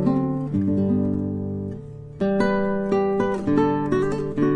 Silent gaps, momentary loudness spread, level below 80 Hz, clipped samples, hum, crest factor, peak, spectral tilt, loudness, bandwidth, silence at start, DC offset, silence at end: none; 8 LU; -46 dBFS; under 0.1%; none; 16 dB; -6 dBFS; -9 dB/octave; -23 LUFS; 9.8 kHz; 0 s; under 0.1%; 0 s